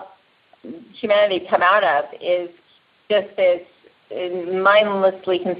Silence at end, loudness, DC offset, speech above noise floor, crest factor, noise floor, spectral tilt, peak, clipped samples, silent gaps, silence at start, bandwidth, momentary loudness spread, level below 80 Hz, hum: 0 s; -19 LUFS; under 0.1%; 38 dB; 18 dB; -56 dBFS; -8.5 dB/octave; -2 dBFS; under 0.1%; none; 0 s; 5.2 kHz; 18 LU; -70 dBFS; none